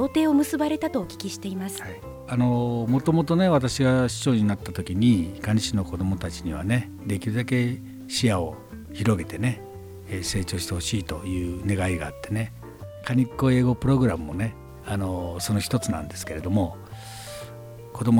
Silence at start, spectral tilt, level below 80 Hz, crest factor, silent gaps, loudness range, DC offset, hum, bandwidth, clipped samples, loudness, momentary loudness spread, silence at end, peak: 0 s; -6 dB/octave; -46 dBFS; 16 dB; none; 6 LU; under 0.1%; none; 17.5 kHz; under 0.1%; -25 LUFS; 16 LU; 0 s; -8 dBFS